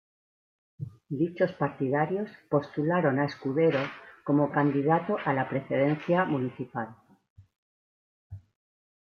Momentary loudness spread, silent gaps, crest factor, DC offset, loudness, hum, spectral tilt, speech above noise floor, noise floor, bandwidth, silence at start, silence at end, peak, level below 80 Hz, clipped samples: 12 LU; 7.30-7.36 s, 7.58-8.30 s; 18 dB; under 0.1%; -28 LUFS; none; -9 dB/octave; over 63 dB; under -90 dBFS; 6.6 kHz; 0.8 s; 0.65 s; -12 dBFS; -70 dBFS; under 0.1%